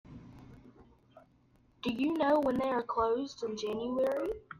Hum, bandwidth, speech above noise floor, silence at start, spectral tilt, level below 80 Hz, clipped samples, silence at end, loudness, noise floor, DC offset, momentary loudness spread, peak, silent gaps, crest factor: none; 15.5 kHz; 35 dB; 0.1 s; -5.5 dB/octave; -62 dBFS; under 0.1%; 0.05 s; -32 LUFS; -66 dBFS; under 0.1%; 12 LU; -18 dBFS; none; 16 dB